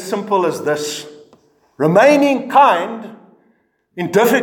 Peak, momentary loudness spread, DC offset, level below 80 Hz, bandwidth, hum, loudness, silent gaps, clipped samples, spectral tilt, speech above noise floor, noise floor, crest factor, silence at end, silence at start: 0 dBFS; 18 LU; under 0.1%; -68 dBFS; 18 kHz; none; -15 LUFS; none; under 0.1%; -5 dB/octave; 46 dB; -60 dBFS; 16 dB; 0 s; 0 s